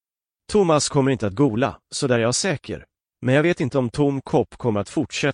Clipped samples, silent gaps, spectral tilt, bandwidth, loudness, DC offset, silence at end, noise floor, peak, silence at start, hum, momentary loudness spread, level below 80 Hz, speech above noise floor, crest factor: under 0.1%; none; -5 dB/octave; 10.5 kHz; -21 LUFS; under 0.1%; 0 s; -51 dBFS; -6 dBFS; 0.5 s; none; 7 LU; -52 dBFS; 30 dB; 14 dB